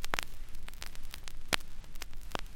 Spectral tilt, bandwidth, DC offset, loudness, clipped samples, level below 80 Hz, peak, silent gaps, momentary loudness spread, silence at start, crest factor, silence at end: -2 dB/octave; 17 kHz; under 0.1%; -40 LUFS; under 0.1%; -42 dBFS; -6 dBFS; none; 15 LU; 0 s; 28 dB; 0 s